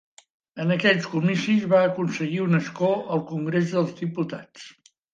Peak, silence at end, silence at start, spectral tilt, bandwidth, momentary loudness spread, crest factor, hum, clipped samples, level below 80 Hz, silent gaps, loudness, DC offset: -6 dBFS; 0.4 s; 0.55 s; -6.5 dB/octave; 7.8 kHz; 11 LU; 18 dB; none; under 0.1%; -70 dBFS; none; -23 LUFS; under 0.1%